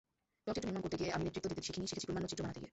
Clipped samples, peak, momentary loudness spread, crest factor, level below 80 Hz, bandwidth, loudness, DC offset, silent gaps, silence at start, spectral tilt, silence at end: under 0.1%; -24 dBFS; 4 LU; 18 dB; -60 dBFS; 8.2 kHz; -41 LUFS; under 0.1%; none; 0.45 s; -5 dB/octave; 0.05 s